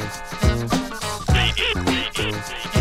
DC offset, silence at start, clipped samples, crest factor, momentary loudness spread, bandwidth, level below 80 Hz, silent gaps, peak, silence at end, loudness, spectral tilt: under 0.1%; 0 s; under 0.1%; 16 dB; 8 LU; 16 kHz; -28 dBFS; none; -6 dBFS; 0 s; -22 LUFS; -4.5 dB/octave